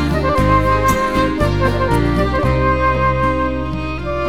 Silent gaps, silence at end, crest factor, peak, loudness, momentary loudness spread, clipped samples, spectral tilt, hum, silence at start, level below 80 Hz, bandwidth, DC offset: none; 0 s; 14 dB; -2 dBFS; -16 LUFS; 6 LU; under 0.1%; -6.5 dB/octave; none; 0 s; -24 dBFS; 16 kHz; 2%